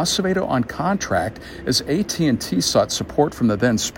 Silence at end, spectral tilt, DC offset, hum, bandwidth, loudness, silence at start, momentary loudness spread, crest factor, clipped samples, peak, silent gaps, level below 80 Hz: 0 s; -4 dB/octave; under 0.1%; none; 17 kHz; -20 LUFS; 0 s; 4 LU; 16 dB; under 0.1%; -4 dBFS; none; -44 dBFS